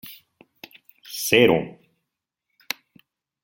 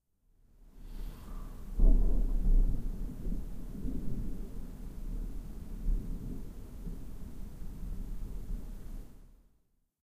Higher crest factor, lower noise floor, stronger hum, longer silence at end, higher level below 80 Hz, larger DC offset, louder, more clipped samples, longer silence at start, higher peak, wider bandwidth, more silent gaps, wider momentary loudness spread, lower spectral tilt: about the same, 24 dB vs 20 dB; first, -82 dBFS vs -72 dBFS; neither; first, 1.75 s vs 0.75 s; second, -64 dBFS vs -34 dBFS; neither; first, -21 LUFS vs -40 LUFS; neither; second, 0.05 s vs 0.6 s; first, -2 dBFS vs -14 dBFS; first, 17 kHz vs 1.9 kHz; neither; first, 21 LU vs 16 LU; second, -4 dB/octave vs -8.5 dB/octave